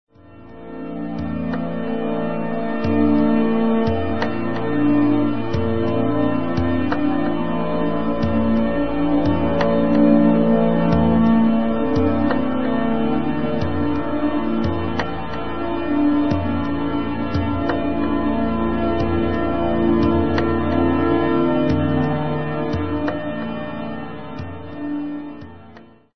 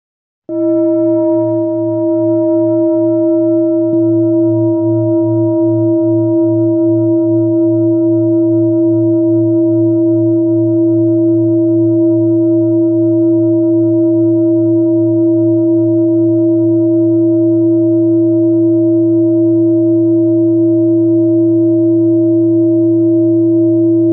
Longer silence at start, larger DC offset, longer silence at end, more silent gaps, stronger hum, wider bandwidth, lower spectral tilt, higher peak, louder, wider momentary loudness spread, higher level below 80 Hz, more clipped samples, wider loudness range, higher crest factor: second, 0.05 s vs 0.5 s; first, 4% vs under 0.1%; about the same, 0 s vs 0 s; neither; neither; first, 6.2 kHz vs 1.4 kHz; second, -9 dB/octave vs -17 dB/octave; about the same, -4 dBFS vs -4 dBFS; second, -20 LUFS vs -11 LUFS; first, 10 LU vs 2 LU; first, -38 dBFS vs -72 dBFS; neither; first, 5 LU vs 1 LU; first, 16 dB vs 6 dB